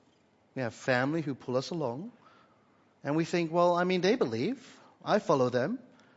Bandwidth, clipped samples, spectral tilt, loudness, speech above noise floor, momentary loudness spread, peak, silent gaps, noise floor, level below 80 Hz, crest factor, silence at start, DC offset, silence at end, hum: 8 kHz; under 0.1%; -6 dB/octave; -30 LUFS; 37 dB; 15 LU; -12 dBFS; none; -66 dBFS; -76 dBFS; 20 dB; 0.55 s; under 0.1%; 0.4 s; none